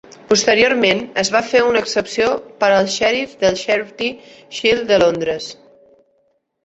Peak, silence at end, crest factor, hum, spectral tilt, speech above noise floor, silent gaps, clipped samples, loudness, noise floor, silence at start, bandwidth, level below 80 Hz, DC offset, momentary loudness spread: 0 dBFS; 1.1 s; 16 dB; none; -3 dB/octave; 47 dB; none; under 0.1%; -16 LUFS; -63 dBFS; 0.3 s; 8.4 kHz; -52 dBFS; under 0.1%; 10 LU